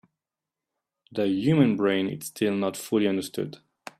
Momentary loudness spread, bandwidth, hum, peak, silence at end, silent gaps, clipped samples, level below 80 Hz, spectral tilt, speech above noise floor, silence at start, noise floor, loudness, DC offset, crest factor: 13 LU; 15 kHz; none; -8 dBFS; 0.45 s; none; under 0.1%; -68 dBFS; -6 dB/octave; 64 dB; 1.1 s; -89 dBFS; -25 LUFS; under 0.1%; 18 dB